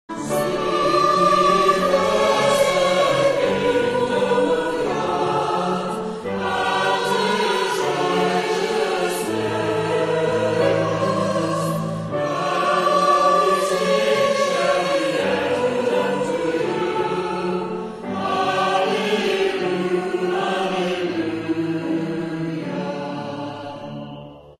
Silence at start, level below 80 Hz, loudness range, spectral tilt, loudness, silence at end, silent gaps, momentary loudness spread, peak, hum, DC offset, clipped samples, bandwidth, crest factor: 0.1 s; -54 dBFS; 5 LU; -4.5 dB/octave; -20 LUFS; 0.1 s; none; 9 LU; -4 dBFS; none; under 0.1%; under 0.1%; 15 kHz; 16 dB